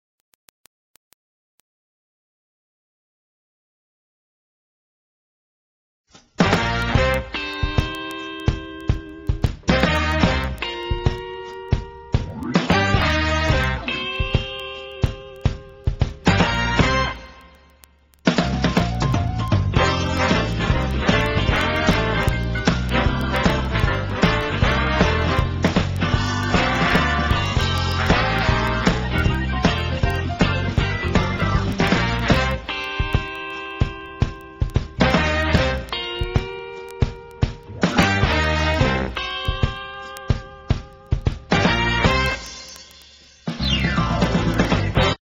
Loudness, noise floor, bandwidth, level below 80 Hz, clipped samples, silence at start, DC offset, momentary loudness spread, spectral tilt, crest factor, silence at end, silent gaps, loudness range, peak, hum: -21 LUFS; -53 dBFS; 16 kHz; -28 dBFS; under 0.1%; 6.4 s; under 0.1%; 9 LU; -5.5 dB/octave; 22 dB; 0.1 s; none; 3 LU; 0 dBFS; none